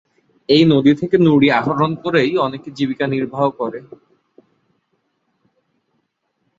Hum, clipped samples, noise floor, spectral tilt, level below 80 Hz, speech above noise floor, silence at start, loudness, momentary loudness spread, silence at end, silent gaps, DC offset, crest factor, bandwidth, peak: none; under 0.1%; -69 dBFS; -7.5 dB/octave; -58 dBFS; 54 dB; 0.5 s; -16 LUFS; 12 LU; 2.75 s; none; under 0.1%; 16 dB; 7.6 kHz; -2 dBFS